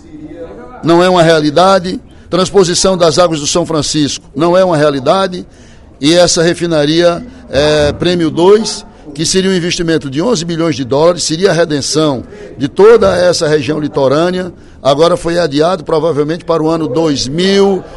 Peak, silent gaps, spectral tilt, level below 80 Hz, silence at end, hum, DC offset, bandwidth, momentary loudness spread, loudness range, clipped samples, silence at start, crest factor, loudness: 0 dBFS; none; -4.5 dB/octave; -38 dBFS; 0 s; none; under 0.1%; 12 kHz; 10 LU; 2 LU; 0.4%; 0.05 s; 10 dB; -11 LUFS